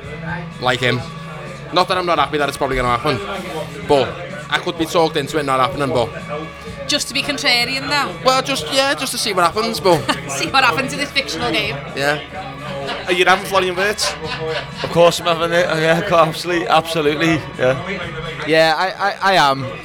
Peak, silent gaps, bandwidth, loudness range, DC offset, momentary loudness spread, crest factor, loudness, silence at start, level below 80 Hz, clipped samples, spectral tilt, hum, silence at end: 0 dBFS; none; 19.5 kHz; 3 LU; under 0.1%; 12 LU; 18 dB; -17 LUFS; 0 s; -42 dBFS; under 0.1%; -3.5 dB/octave; none; 0 s